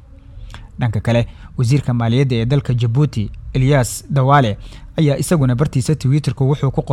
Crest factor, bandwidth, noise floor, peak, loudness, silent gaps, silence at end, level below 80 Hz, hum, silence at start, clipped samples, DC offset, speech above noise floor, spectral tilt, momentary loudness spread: 16 dB; 13.5 kHz; -36 dBFS; 0 dBFS; -17 LUFS; none; 0 s; -36 dBFS; none; 0.3 s; under 0.1%; under 0.1%; 20 dB; -6.5 dB/octave; 10 LU